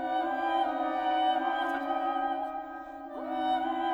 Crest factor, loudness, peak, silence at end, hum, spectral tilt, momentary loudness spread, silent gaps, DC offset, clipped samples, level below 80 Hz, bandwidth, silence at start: 12 dB; -30 LUFS; -18 dBFS; 0 s; none; -4 dB/octave; 12 LU; none; under 0.1%; under 0.1%; -66 dBFS; 8.6 kHz; 0 s